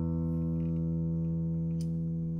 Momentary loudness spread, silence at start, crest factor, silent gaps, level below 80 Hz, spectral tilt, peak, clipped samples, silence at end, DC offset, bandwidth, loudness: 1 LU; 0 s; 8 dB; none; -46 dBFS; -11 dB/octave; -24 dBFS; under 0.1%; 0 s; under 0.1%; 5.4 kHz; -32 LUFS